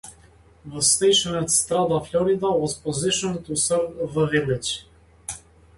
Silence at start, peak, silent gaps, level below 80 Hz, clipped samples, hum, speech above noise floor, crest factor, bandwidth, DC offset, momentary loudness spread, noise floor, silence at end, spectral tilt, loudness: 0.05 s; -6 dBFS; none; -52 dBFS; under 0.1%; none; 30 dB; 18 dB; 12 kHz; under 0.1%; 17 LU; -52 dBFS; 0.4 s; -3 dB/octave; -21 LUFS